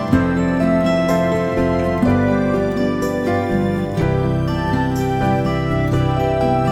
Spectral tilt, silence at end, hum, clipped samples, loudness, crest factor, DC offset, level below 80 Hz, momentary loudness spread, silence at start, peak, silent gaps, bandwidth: -7.5 dB/octave; 0 s; none; under 0.1%; -18 LUFS; 16 dB; under 0.1%; -32 dBFS; 3 LU; 0 s; -2 dBFS; none; 14.5 kHz